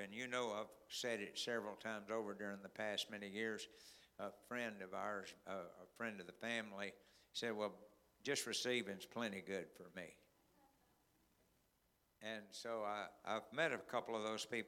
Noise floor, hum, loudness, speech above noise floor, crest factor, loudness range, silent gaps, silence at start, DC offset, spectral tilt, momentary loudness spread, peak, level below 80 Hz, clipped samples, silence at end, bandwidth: -80 dBFS; none; -46 LUFS; 34 dB; 24 dB; 7 LU; none; 0 s; under 0.1%; -3 dB/octave; 11 LU; -24 dBFS; -86 dBFS; under 0.1%; 0 s; 18 kHz